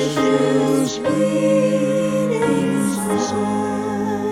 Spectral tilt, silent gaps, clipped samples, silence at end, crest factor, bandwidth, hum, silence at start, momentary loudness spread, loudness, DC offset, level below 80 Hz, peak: -5.5 dB/octave; none; under 0.1%; 0 s; 14 dB; 16 kHz; none; 0 s; 5 LU; -19 LUFS; under 0.1%; -54 dBFS; -6 dBFS